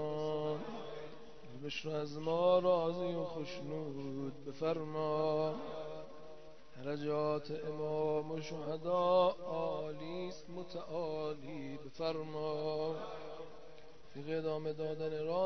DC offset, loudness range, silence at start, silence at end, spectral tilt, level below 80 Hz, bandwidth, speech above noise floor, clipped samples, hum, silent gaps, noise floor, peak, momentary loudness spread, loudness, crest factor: 0.3%; 5 LU; 0 s; 0 s; -5 dB/octave; -70 dBFS; 6.2 kHz; 20 dB; under 0.1%; none; none; -57 dBFS; -18 dBFS; 17 LU; -38 LUFS; 20 dB